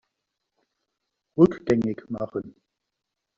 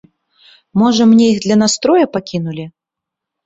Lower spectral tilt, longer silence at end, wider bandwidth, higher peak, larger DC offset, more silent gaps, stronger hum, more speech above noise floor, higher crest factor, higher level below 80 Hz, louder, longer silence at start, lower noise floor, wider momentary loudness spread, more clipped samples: first, -8.5 dB/octave vs -5 dB/octave; about the same, 0.85 s vs 0.75 s; about the same, 7.4 kHz vs 7.8 kHz; about the same, -4 dBFS vs -2 dBFS; neither; neither; neither; second, 60 dB vs 70 dB; first, 24 dB vs 12 dB; about the same, -58 dBFS vs -54 dBFS; second, -24 LUFS vs -12 LUFS; first, 1.35 s vs 0.75 s; about the same, -83 dBFS vs -82 dBFS; about the same, 15 LU vs 15 LU; neither